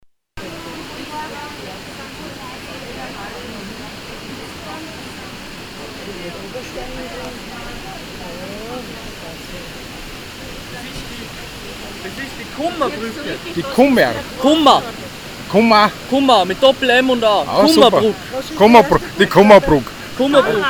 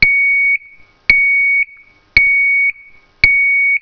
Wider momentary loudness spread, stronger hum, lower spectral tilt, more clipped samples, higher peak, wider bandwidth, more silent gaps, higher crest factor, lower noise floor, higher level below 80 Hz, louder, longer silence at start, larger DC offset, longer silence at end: first, 20 LU vs 7 LU; neither; first, -4.5 dB/octave vs -3 dB/octave; second, under 0.1% vs 0.5%; about the same, 0 dBFS vs 0 dBFS; first, over 20 kHz vs 5.4 kHz; neither; about the same, 16 dB vs 14 dB; second, -34 dBFS vs -43 dBFS; about the same, -40 dBFS vs -36 dBFS; second, -13 LUFS vs -10 LUFS; first, 0.35 s vs 0 s; neither; about the same, 0 s vs 0.05 s